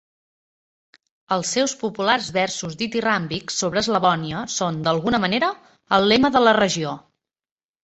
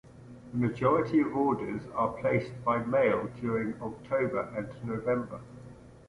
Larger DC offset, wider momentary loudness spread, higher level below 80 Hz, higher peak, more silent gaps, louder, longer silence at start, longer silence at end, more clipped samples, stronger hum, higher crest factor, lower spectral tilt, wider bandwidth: neither; second, 10 LU vs 14 LU; about the same, -56 dBFS vs -58 dBFS; first, -2 dBFS vs -12 dBFS; neither; first, -21 LUFS vs -30 LUFS; first, 1.3 s vs 0.05 s; first, 0.85 s vs 0.1 s; neither; neither; about the same, 20 dB vs 18 dB; second, -3.5 dB/octave vs -8.5 dB/octave; second, 8.2 kHz vs 11 kHz